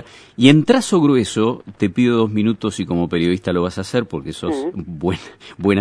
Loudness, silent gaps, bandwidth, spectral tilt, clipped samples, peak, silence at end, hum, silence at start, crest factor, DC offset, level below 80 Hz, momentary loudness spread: -18 LUFS; none; 11 kHz; -6 dB/octave; under 0.1%; 0 dBFS; 0 s; none; 0.4 s; 18 dB; under 0.1%; -48 dBFS; 11 LU